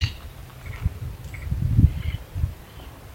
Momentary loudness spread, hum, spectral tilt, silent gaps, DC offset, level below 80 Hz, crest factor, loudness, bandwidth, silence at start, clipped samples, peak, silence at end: 21 LU; none; -7 dB/octave; none; under 0.1%; -32 dBFS; 22 dB; -26 LUFS; 16.5 kHz; 0 s; under 0.1%; -4 dBFS; 0 s